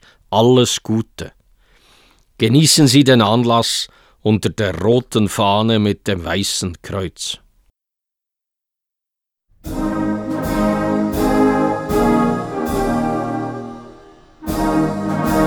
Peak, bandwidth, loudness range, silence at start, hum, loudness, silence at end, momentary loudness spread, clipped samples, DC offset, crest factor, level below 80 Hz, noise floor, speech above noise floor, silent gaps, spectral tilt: 0 dBFS; over 20 kHz; 11 LU; 0.3 s; none; -16 LUFS; 0 s; 13 LU; under 0.1%; under 0.1%; 18 dB; -38 dBFS; -84 dBFS; 69 dB; none; -5 dB/octave